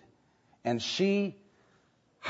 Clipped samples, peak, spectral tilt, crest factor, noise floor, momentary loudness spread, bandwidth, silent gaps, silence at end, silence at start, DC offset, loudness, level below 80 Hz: under 0.1%; -16 dBFS; -5 dB/octave; 18 dB; -68 dBFS; 9 LU; 8 kHz; none; 0 s; 0.65 s; under 0.1%; -31 LUFS; -76 dBFS